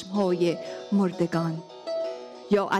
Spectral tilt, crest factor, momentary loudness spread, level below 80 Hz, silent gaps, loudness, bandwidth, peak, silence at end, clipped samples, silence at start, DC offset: -7 dB/octave; 14 dB; 10 LU; -68 dBFS; none; -27 LUFS; 12 kHz; -12 dBFS; 0 s; under 0.1%; 0 s; under 0.1%